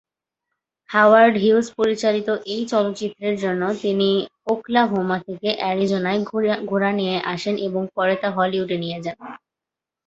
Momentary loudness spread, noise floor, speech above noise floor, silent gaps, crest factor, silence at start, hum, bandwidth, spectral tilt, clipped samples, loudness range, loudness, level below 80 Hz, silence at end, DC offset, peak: 10 LU; -87 dBFS; 67 dB; none; 20 dB; 0.9 s; none; 8.2 kHz; -5.5 dB/octave; under 0.1%; 4 LU; -20 LUFS; -64 dBFS; 0.7 s; under 0.1%; -2 dBFS